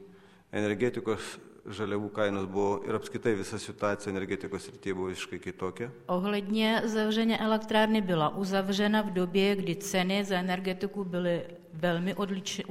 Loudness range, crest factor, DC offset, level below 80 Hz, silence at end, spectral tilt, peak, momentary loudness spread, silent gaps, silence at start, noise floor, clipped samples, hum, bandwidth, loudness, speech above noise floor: 6 LU; 18 dB; under 0.1%; -64 dBFS; 0 s; -5 dB/octave; -12 dBFS; 10 LU; none; 0 s; -55 dBFS; under 0.1%; none; 16 kHz; -30 LUFS; 25 dB